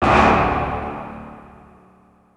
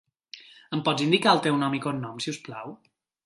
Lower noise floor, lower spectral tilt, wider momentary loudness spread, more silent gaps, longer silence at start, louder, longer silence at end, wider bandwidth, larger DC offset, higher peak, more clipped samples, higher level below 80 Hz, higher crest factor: first, -53 dBFS vs -49 dBFS; first, -6.5 dB/octave vs -5 dB/octave; about the same, 23 LU vs 24 LU; neither; second, 0 s vs 0.35 s; first, -18 LUFS vs -25 LUFS; first, 0.95 s vs 0.5 s; about the same, 11 kHz vs 11.5 kHz; neither; first, 0 dBFS vs -4 dBFS; neither; first, -34 dBFS vs -72 dBFS; about the same, 20 dB vs 24 dB